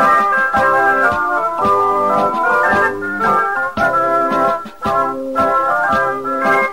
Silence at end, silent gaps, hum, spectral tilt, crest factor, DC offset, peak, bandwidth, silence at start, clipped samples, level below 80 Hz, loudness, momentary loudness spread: 0 s; none; none; -5 dB/octave; 12 dB; 0.9%; -4 dBFS; 16 kHz; 0 s; under 0.1%; -46 dBFS; -14 LUFS; 5 LU